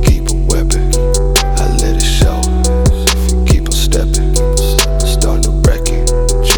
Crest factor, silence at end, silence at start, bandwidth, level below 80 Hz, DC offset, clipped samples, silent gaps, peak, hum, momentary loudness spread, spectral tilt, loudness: 10 dB; 0 s; 0 s; over 20 kHz; -12 dBFS; under 0.1%; under 0.1%; none; 0 dBFS; none; 2 LU; -4 dB/octave; -13 LUFS